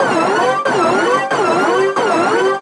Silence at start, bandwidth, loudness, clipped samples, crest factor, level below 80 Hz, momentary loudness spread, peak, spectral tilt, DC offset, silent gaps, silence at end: 0 s; 12 kHz; -14 LUFS; under 0.1%; 12 dB; -66 dBFS; 1 LU; -2 dBFS; -4 dB/octave; under 0.1%; none; 0 s